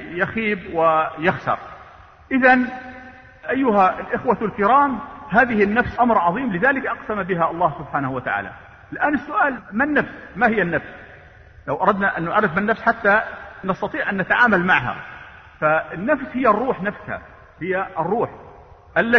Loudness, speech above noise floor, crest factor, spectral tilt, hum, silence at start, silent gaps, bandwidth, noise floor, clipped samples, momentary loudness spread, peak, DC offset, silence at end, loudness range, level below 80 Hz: -20 LUFS; 25 dB; 18 dB; -8 dB/octave; none; 0 s; none; 6.4 kHz; -45 dBFS; under 0.1%; 15 LU; -2 dBFS; under 0.1%; 0 s; 4 LU; -48 dBFS